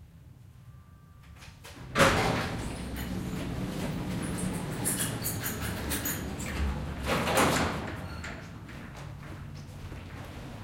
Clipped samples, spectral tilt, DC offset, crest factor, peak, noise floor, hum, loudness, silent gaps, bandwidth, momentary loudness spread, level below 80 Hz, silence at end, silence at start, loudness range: under 0.1%; -4 dB/octave; under 0.1%; 24 dB; -10 dBFS; -52 dBFS; none; -31 LUFS; none; 16.5 kHz; 19 LU; -44 dBFS; 0 s; 0 s; 3 LU